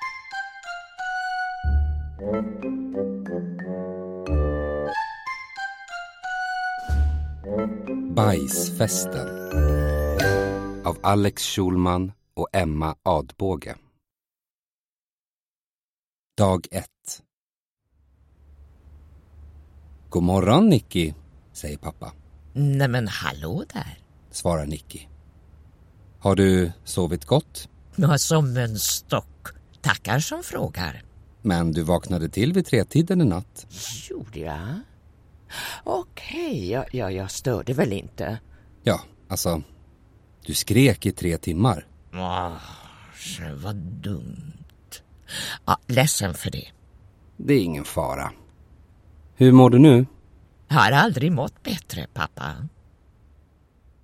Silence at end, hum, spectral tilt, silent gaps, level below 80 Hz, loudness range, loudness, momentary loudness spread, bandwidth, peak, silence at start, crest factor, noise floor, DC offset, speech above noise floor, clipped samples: 1.35 s; none; -5.5 dB/octave; 14.51-16.26 s, 17.33-17.77 s; -36 dBFS; 12 LU; -23 LUFS; 17 LU; 16.5 kHz; 0 dBFS; 0 s; 24 dB; under -90 dBFS; under 0.1%; over 68 dB; under 0.1%